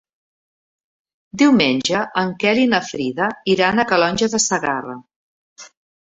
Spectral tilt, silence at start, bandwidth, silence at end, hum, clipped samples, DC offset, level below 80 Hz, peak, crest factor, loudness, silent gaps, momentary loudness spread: -3.5 dB/octave; 1.35 s; 8 kHz; 0.5 s; none; under 0.1%; under 0.1%; -56 dBFS; -2 dBFS; 18 dB; -17 LUFS; 5.16-5.56 s; 10 LU